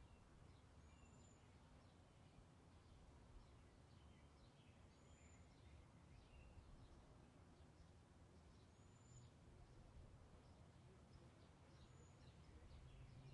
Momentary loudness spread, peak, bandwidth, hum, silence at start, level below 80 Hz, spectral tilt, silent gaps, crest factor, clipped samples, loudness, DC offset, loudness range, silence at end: 3 LU; -52 dBFS; 10.5 kHz; none; 0 s; -72 dBFS; -5.5 dB/octave; none; 14 dB; under 0.1%; -68 LUFS; under 0.1%; 2 LU; 0 s